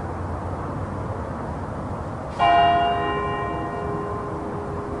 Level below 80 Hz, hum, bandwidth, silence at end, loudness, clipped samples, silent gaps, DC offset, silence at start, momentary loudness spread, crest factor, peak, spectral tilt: -42 dBFS; none; 11 kHz; 0 s; -25 LUFS; under 0.1%; none; under 0.1%; 0 s; 13 LU; 18 dB; -8 dBFS; -7 dB/octave